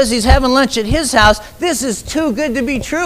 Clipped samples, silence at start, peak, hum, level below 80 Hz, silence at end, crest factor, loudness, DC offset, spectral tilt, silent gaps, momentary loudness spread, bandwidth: under 0.1%; 0 s; 0 dBFS; none; -22 dBFS; 0 s; 14 dB; -14 LUFS; under 0.1%; -4 dB/octave; none; 8 LU; 16 kHz